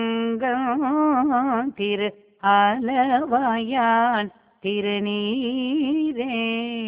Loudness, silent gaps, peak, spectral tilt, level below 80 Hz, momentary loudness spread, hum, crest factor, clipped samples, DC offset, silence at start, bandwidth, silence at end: -22 LUFS; none; -6 dBFS; -9 dB/octave; -64 dBFS; 7 LU; none; 16 dB; under 0.1%; under 0.1%; 0 s; 4 kHz; 0 s